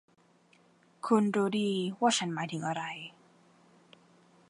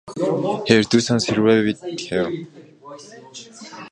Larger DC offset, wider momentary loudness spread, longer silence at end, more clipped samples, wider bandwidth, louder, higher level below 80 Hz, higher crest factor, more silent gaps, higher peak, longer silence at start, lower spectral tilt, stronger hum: neither; second, 14 LU vs 23 LU; first, 1.4 s vs 0.05 s; neither; about the same, 11.5 kHz vs 11 kHz; second, -30 LUFS vs -19 LUFS; second, -82 dBFS vs -56 dBFS; about the same, 22 dB vs 20 dB; neither; second, -12 dBFS vs 0 dBFS; first, 1.05 s vs 0.05 s; about the same, -4.5 dB/octave vs -5 dB/octave; neither